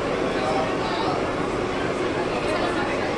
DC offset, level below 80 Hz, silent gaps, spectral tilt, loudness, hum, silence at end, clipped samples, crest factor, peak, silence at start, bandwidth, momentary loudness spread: under 0.1%; -44 dBFS; none; -5 dB/octave; -24 LUFS; none; 0 s; under 0.1%; 12 dB; -12 dBFS; 0 s; 11.5 kHz; 2 LU